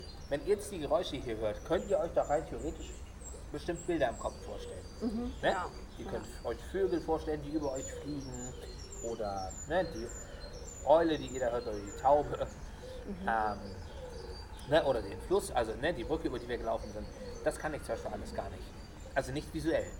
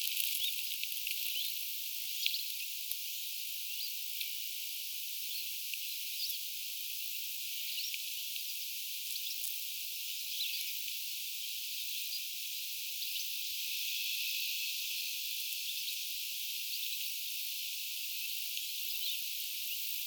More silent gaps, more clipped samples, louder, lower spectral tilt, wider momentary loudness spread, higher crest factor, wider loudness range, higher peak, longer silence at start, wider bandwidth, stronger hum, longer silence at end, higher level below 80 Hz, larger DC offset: neither; neither; about the same, -35 LUFS vs -36 LUFS; first, -5 dB/octave vs 11.5 dB/octave; first, 15 LU vs 4 LU; second, 22 dB vs 28 dB; first, 6 LU vs 2 LU; second, -14 dBFS vs -10 dBFS; about the same, 0 s vs 0 s; about the same, 18.5 kHz vs over 20 kHz; neither; about the same, 0 s vs 0 s; first, -48 dBFS vs under -90 dBFS; neither